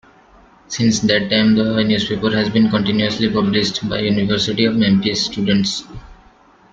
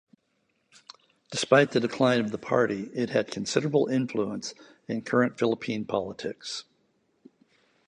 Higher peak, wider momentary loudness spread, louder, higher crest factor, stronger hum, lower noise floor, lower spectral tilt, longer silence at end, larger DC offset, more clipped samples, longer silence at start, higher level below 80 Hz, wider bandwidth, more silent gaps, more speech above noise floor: first, -2 dBFS vs -6 dBFS; second, 5 LU vs 14 LU; first, -16 LUFS vs -27 LUFS; second, 16 dB vs 22 dB; neither; second, -49 dBFS vs -73 dBFS; about the same, -5 dB/octave vs -5 dB/octave; second, 0.6 s vs 1.25 s; neither; neither; second, 0.7 s vs 1.3 s; first, -46 dBFS vs -68 dBFS; second, 7.6 kHz vs 10.5 kHz; neither; second, 33 dB vs 47 dB